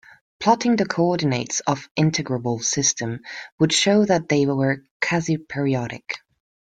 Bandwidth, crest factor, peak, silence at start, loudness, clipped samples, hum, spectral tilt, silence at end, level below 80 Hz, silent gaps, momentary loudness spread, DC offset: 10 kHz; 18 dB; -4 dBFS; 0.4 s; -21 LUFS; under 0.1%; none; -4 dB/octave; 0.55 s; -60 dBFS; 1.91-1.95 s, 3.52-3.58 s, 4.91-5.00 s; 11 LU; under 0.1%